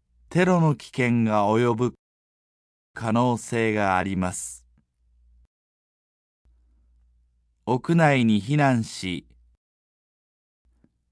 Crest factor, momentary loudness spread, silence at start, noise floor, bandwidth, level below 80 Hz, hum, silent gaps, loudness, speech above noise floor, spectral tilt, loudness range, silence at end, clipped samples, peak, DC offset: 18 dB; 13 LU; 0.3 s; -66 dBFS; 11 kHz; -60 dBFS; none; 1.99-2.94 s, 5.47-6.45 s; -23 LUFS; 44 dB; -6.5 dB/octave; 8 LU; 1.9 s; under 0.1%; -8 dBFS; under 0.1%